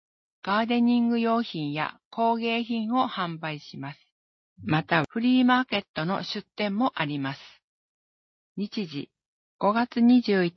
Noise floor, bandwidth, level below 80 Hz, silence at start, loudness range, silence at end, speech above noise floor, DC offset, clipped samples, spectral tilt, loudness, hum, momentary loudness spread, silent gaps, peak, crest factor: under -90 dBFS; 6.2 kHz; -70 dBFS; 0.45 s; 6 LU; 0.05 s; over 65 dB; under 0.1%; under 0.1%; -7 dB/octave; -26 LUFS; none; 16 LU; 2.05-2.11 s, 4.12-4.56 s, 5.89-5.94 s, 7.64-8.55 s, 9.28-9.59 s; -8 dBFS; 20 dB